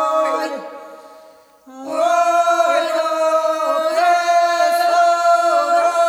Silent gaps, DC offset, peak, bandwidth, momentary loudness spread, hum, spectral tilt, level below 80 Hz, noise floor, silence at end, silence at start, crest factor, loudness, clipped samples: none; under 0.1%; -4 dBFS; 15 kHz; 12 LU; none; -0.5 dB/octave; -80 dBFS; -46 dBFS; 0 s; 0 s; 14 dB; -16 LUFS; under 0.1%